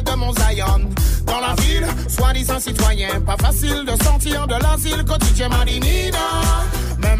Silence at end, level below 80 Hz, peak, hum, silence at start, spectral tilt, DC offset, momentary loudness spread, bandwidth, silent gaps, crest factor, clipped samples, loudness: 0 s; -18 dBFS; -4 dBFS; none; 0 s; -4 dB/octave; under 0.1%; 3 LU; 16 kHz; none; 12 dB; under 0.1%; -18 LUFS